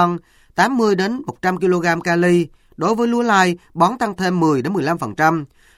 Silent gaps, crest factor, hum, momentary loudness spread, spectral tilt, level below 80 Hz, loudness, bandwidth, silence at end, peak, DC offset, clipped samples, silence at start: none; 16 dB; none; 7 LU; -6 dB/octave; -54 dBFS; -18 LUFS; 15 kHz; 0.3 s; -2 dBFS; under 0.1%; under 0.1%; 0 s